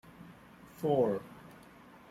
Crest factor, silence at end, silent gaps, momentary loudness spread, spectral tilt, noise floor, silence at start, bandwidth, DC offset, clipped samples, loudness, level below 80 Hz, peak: 18 dB; 0.6 s; none; 25 LU; -8 dB/octave; -56 dBFS; 0.2 s; 15.5 kHz; under 0.1%; under 0.1%; -32 LUFS; -68 dBFS; -18 dBFS